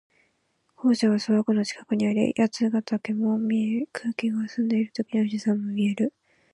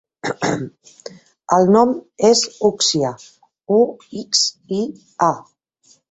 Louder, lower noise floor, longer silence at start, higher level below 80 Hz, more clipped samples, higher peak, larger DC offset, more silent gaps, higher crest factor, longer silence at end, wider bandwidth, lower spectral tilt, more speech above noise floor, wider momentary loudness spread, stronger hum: second, -25 LUFS vs -18 LUFS; first, -71 dBFS vs -56 dBFS; first, 0.8 s vs 0.25 s; second, -70 dBFS vs -60 dBFS; neither; second, -8 dBFS vs -2 dBFS; neither; neither; about the same, 16 dB vs 18 dB; second, 0.45 s vs 0.7 s; first, 11 kHz vs 8.2 kHz; first, -6 dB/octave vs -3.5 dB/octave; first, 47 dB vs 38 dB; second, 6 LU vs 19 LU; neither